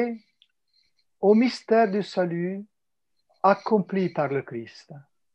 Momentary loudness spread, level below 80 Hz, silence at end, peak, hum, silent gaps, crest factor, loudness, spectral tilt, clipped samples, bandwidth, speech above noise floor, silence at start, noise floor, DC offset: 17 LU; -76 dBFS; 0.35 s; -6 dBFS; none; none; 20 dB; -24 LUFS; -7.5 dB/octave; under 0.1%; 8.6 kHz; 57 dB; 0 s; -81 dBFS; under 0.1%